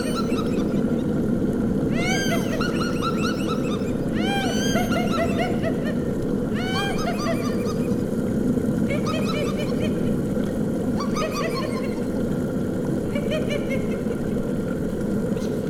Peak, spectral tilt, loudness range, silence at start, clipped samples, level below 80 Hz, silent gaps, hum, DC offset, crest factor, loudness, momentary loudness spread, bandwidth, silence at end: -8 dBFS; -6 dB/octave; 2 LU; 0 s; under 0.1%; -40 dBFS; none; none; under 0.1%; 14 dB; -24 LUFS; 3 LU; 17.5 kHz; 0 s